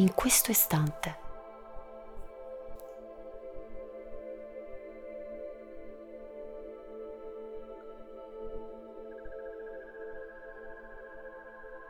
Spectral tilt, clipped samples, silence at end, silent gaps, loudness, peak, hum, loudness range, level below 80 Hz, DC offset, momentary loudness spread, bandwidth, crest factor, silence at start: -4 dB/octave; under 0.1%; 0 s; none; -33 LUFS; -12 dBFS; none; 13 LU; -54 dBFS; under 0.1%; 21 LU; over 20 kHz; 26 dB; 0 s